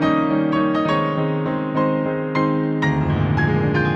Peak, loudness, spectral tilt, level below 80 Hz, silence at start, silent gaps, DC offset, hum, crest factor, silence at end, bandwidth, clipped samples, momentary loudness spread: -6 dBFS; -20 LUFS; -8.5 dB/octave; -42 dBFS; 0 s; none; under 0.1%; none; 14 dB; 0 s; 7 kHz; under 0.1%; 3 LU